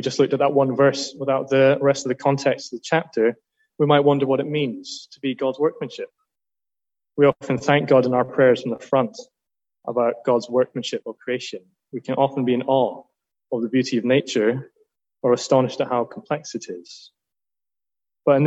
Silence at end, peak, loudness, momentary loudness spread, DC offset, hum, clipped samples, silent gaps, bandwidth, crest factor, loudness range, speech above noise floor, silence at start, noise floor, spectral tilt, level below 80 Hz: 0 s; -4 dBFS; -21 LUFS; 15 LU; under 0.1%; none; under 0.1%; none; 8.2 kHz; 18 dB; 5 LU; over 69 dB; 0 s; under -90 dBFS; -6 dB/octave; -68 dBFS